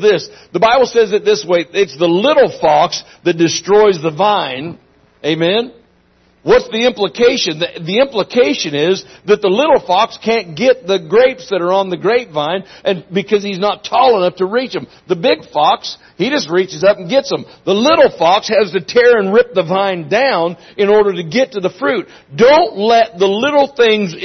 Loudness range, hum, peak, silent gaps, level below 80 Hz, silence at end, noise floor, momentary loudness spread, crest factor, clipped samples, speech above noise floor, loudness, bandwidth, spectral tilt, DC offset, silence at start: 3 LU; none; 0 dBFS; none; -52 dBFS; 0 s; -52 dBFS; 9 LU; 14 dB; under 0.1%; 40 dB; -13 LUFS; 6.4 kHz; -4.5 dB/octave; under 0.1%; 0 s